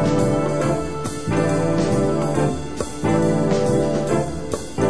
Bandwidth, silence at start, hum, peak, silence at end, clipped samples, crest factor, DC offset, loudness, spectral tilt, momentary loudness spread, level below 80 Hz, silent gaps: 11 kHz; 0 s; none; -6 dBFS; 0 s; under 0.1%; 14 dB; 2%; -21 LUFS; -6.5 dB/octave; 8 LU; -40 dBFS; none